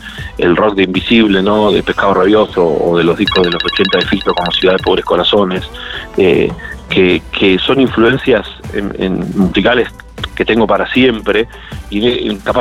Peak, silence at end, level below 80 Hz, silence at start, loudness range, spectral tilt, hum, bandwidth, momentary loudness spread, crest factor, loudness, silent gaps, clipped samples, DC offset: 0 dBFS; 0 s; -34 dBFS; 0 s; 2 LU; -6.5 dB/octave; none; 13 kHz; 10 LU; 12 dB; -12 LUFS; none; under 0.1%; under 0.1%